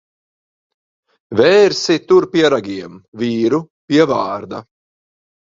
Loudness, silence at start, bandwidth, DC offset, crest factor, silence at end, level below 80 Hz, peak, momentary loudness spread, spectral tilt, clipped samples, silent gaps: -14 LUFS; 1.3 s; 7.8 kHz; under 0.1%; 16 dB; 0.9 s; -56 dBFS; 0 dBFS; 17 LU; -5 dB/octave; under 0.1%; 3.08-3.12 s, 3.70-3.88 s